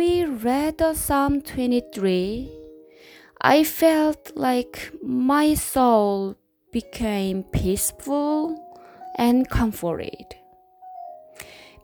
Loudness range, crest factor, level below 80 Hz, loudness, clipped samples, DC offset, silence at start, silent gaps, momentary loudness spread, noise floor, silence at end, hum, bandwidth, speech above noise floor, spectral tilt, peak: 5 LU; 20 dB; -40 dBFS; -22 LUFS; under 0.1%; under 0.1%; 0 s; none; 21 LU; -49 dBFS; 0.25 s; none; over 20 kHz; 27 dB; -5 dB/octave; -2 dBFS